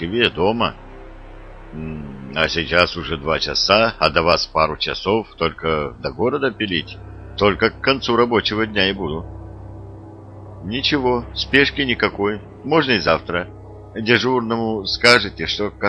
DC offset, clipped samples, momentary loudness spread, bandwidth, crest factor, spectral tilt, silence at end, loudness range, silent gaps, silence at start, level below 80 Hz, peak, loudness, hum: under 0.1%; under 0.1%; 19 LU; 11 kHz; 20 dB; -4.5 dB/octave; 0 s; 3 LU; none; 0 s; -40 dBFS; 0 dBFS; -18 LUFS; none